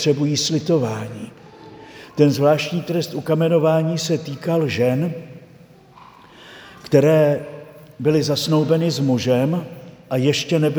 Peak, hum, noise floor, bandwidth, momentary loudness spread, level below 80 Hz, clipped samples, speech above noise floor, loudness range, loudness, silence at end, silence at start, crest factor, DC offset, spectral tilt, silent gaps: 0 dBFS; none; -47 dBFS; over 20 kHz; 20 LU; -60 dBFS; under 0.1%; 29 dB; 3 LU; -19 LUFS; 0 s; 0 s; 20 dB; under 0.1%; -6 dB/octave; none